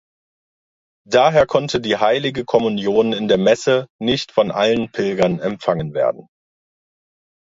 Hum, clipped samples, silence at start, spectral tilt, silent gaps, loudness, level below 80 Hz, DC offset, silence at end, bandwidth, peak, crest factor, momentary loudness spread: none; under 0.1%; 1.1 s; -5.5 dB/octave; 3.90-3.99 s; -18 LUFS; -52 dBFS; under 0.1%; 1.25 s; 7.8 kHz; 0 dBFS; 18 dB; 6 LU